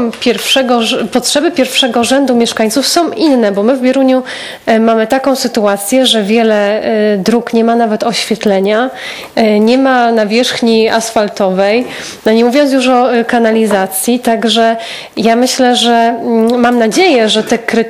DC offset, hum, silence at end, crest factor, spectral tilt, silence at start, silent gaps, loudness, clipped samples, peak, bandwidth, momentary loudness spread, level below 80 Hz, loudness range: under 0.1%; none; 0 s; 10 dB; -3.5 dB/octave; 0 s; none; -10 LUFS; 0.2%; 0 dBFS; 17 kHz; 4 LU; -52 dBFS; 1 LU